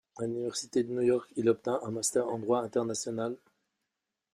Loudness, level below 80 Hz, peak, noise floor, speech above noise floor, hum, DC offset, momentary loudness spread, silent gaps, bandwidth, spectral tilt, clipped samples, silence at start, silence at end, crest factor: -31 LUFS; -74 dBFS; -14 dBFS; -87 dBFS; 56 dB; none; under 0.1%; 7 LU; none; 15.5 kHz; -4.5 dB/octave; under 0.1%; 0.15 s; 0.95 s; 18 dB